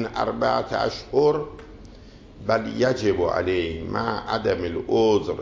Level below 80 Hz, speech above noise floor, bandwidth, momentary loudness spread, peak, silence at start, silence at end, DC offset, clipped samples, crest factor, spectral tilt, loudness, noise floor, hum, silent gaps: -44 dBFS; 22 dB; 7.6 kHz; 7 LU; -6 dBFS; 0 s; 0 s; under 0.1%; under 0.1%; 16 dB; -6 dB/octave; -23 LUFS; -45 dBFS; none; none